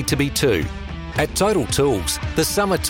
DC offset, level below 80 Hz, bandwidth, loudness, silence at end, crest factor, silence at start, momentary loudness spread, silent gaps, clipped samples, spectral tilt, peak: under 0.1%; -34 dBFS; 17 kHz; -20 LUFS; 0 s; 14 dB; 0 s; 7 LU; none; under 0.1%; -4 dB/octave; -6 dBFS